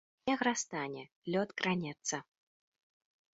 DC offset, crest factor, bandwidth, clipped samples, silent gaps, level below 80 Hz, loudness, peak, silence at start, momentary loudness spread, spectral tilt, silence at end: under 0.1%; 22 dB; 7.6 kHz; under 0.1%; 1.12-1.22 s; -76 dBFS; -36 LUFS; -16 dBFS; 0.25 s; 10 LU; -3.5 dB/octave; 1.1 s